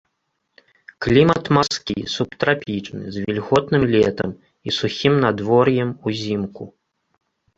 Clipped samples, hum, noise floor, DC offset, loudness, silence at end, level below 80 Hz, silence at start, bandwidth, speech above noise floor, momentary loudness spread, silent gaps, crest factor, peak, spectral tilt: under 0.1%; none; -73 dBFS; under 0.1%; -19 LUFS; 0.9 s; -48 dBFS; 1 s; 8 kHz; 54 dB; 12 LU; none; 18 dB; -2 dBFS; -6 dB/octave